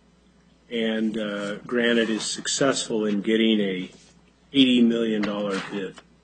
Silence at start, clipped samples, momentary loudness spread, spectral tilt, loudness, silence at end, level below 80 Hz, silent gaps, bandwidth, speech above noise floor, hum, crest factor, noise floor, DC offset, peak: 0.7 s; under 0.1%; 13 LU; -4 dB/octave; -23 LUFS; 0.25 s; -64 dBFS; none; 9.4 kHz; 34 dB; none; 20 dB; -58 dBFS; under 0.1%; -4 dBFS